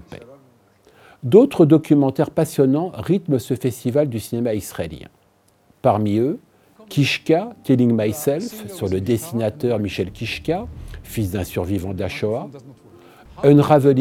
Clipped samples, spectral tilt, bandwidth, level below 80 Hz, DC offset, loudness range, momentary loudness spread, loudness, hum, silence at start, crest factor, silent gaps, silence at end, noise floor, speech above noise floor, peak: under 0.1%; -7 dB/octave; 17 kHz; -50 dBFS; under 0.1%; 7 LU; 14 LU; -19 LUFS; none; 0.1 s; 20 dB; none; 0 s; -58 dBFS; 40 dB; 0 dBFS